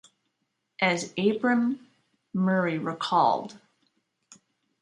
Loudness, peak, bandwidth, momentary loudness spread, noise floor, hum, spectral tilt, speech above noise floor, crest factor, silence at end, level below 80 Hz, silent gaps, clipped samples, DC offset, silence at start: -26 LUFS; -8 dBFS; 11 kHz; 9 LU; -79 dBFS; none; -5.5 dB/octave; 53 dB; 20 dB; 1.25 s; -74 dBFS; none; under 0.1%; under 0.1%; 0.8 s